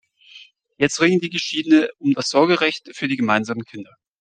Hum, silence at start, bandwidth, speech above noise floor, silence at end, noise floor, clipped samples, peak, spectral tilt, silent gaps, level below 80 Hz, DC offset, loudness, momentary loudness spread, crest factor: none; 0.35 s; 9.4 kHz; 28 dB; 0.35 s; -47 dBFS; under 0.1%; -2 dBFS; -4.5 dB/octave; none; -64 dBFS; under 0.1%; -19 LUFS; 11 LU; 18 dB